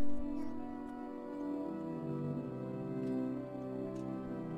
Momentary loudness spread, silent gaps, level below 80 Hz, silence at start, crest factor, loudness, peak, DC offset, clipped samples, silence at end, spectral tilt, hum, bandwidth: 6 LU; none; -58 dBFS; 0 s; 14 dB; -41 LUFS; -22 dBFS; under 0.1%; under 0.1%; 0 s; -9.5 dB/octave; none; 9.2 kHz